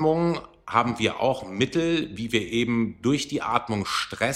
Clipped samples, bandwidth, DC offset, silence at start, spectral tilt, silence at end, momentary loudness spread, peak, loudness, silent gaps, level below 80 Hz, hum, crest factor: under 0.1%; 15 kHz; under 0.1%; 0 s; -5 dB/octave; 0 s; 4 LU; -4 dBFS; -25 LUFS; none; -54 dBFS; none; 20 dB